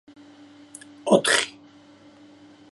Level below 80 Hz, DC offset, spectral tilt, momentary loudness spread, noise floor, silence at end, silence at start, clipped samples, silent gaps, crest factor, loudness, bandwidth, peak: -70 dBFS; under 0.1%; -2.5 dB/octave; 26 LU; -51 dBFS; 1.25 s; 1.05 s; under 0.1%; none; 24 dB; -21 LUFS; 11.5 kHz; -4 dBFS